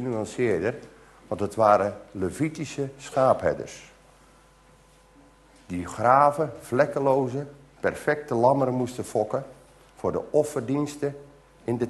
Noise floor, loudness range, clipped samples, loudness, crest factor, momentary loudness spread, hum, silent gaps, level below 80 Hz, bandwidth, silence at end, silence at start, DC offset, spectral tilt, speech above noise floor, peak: -56 dBFS; 5 LU; under 0.1%; -25 LUFS; 22 dB; 15 LU; none; none; -60 dBFS; 12.5 kHz; 0 s; 0 s; under 0.1%; -6.5 dB/octave; 31 dB; -4 dBFS